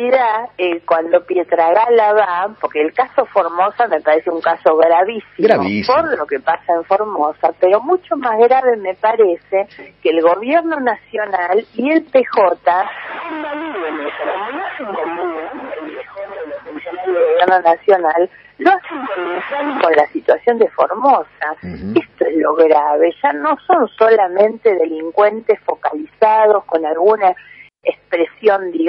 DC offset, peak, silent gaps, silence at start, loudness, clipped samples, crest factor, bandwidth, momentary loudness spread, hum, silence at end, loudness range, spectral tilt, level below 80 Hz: under 0.1%; 0 dBFS; none; 0 s; -15 LUFS; under 0.1%; 14 dB; 5.8 kHz; 11 LU; 50 Hz at -60 dBFS; 0 s; 4 LU; -7.5 dB/octave; -58 dBFS